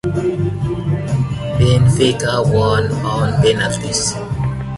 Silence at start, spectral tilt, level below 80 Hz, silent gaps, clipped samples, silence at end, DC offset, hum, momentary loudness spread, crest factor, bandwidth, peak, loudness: 0.05 s; -5.5 dB/octave; -32 dBFS; none; under 0.1%; 0 s; under 0.1%; none; 8 LU; 14 dB; 11.5 kHz; -2 dBFS; -16 LUFS